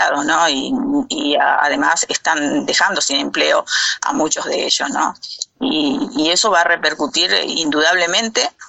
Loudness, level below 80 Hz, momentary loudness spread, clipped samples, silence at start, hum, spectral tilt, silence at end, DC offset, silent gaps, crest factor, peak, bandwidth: -15 LUFS; -56 dBFS; 5 LU; under 0.1%; 0 s; none; -1 dB/octave; 0 s; under 0.1%; none; 16 dB; -2 dBFS; 8.6 kHz